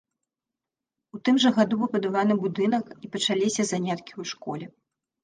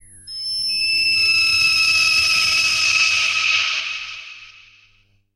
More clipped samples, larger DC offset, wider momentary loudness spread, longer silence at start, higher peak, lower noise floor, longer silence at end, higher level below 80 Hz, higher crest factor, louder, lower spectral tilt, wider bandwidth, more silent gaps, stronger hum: neither; neither; about the same, 14 LU vs 14 LU; first, 1.15 s vs 0.25 s; about the same, -6 dBFS vs -6 dBFS; first, -88 dBFS vs -58 dBFS; second, 0.55 s vs 0.85 s; second, -72 dBFS vs -52 dBFS; first, 20 dB vs 14 dB; second, -25 LUFS vs -15 LUFS; first, -4.5 dB/octave vs 2 dB/octave; second, 9.8 kHz vs 16 kHz; neither; neither